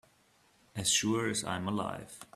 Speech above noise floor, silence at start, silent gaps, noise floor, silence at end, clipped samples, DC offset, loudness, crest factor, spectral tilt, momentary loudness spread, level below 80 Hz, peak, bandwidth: 34 dB; 0.75 s; none; -67 dBFS; 0.1 s; under 0.1%; under 0.1%; -32 LUFS; 22 dB; -3 dB/octave; 14 LU; -66 dBFS; -14 dBFS; 15.5 kHz